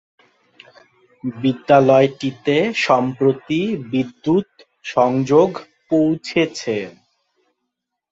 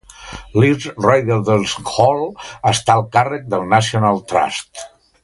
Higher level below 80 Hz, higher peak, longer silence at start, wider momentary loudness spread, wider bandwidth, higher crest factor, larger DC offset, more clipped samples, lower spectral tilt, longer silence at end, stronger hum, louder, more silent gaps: second, -60 dBFS vs -46 dBFS; about the same, -2 dBFS vs 0 dBFS; first, 1.25 s vs 0.2 s; about the same, 12 LU vs 12 LU; second, 8 kHz vs 11.5 kHz; about the same, 18 dB vs 16 dB; neither; neither; first, -6.5 dB/octave vs -5 dB/octave; first, 1.2 s vs 0.35 s; neither; about the same, -18 LUFS vs -16 LUFS; neither